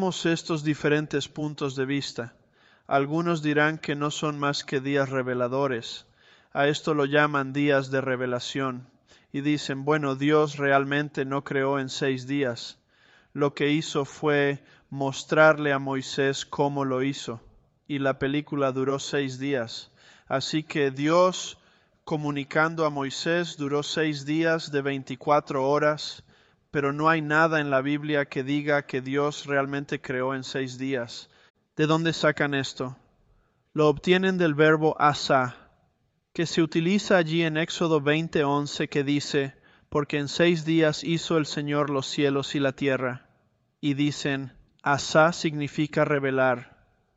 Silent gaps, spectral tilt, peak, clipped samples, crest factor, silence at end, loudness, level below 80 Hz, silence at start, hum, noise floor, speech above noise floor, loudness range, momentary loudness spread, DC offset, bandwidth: 31.50-31.54 s; -5.5 dB/octave; -6 dBFS; under 0.1%; 20 dB; 0.5 s; -25 LUFS; -64 dBFS; 0 s; none; -71 dBFS; 46 dB; 4 LU; 10 LU; under 0.1%; 8.2 kHz